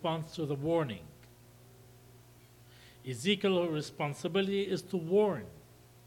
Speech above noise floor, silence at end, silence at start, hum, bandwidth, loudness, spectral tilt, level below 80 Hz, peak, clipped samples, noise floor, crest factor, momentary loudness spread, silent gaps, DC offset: 26 dB; 0.45 s; 0 s; 60 Hz at -60 dBFS; 18 kHz; -33 LUFS; -5.5 dB/octave; -68 dBFS; -16 dBFS; under 0.1%; -58 dBFS; 18 dB; 15 LU; none; under 0.1%